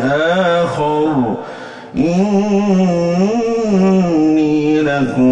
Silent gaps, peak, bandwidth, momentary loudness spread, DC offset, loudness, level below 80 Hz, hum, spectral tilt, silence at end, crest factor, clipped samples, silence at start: none; -4 dBFS; 8.6 kHz; 6 LU; under 0.1%; -14 LUFS; -46 dBFS; none; -7 dB/octave; 0 s; 10 dB; under 0.1%; 0 s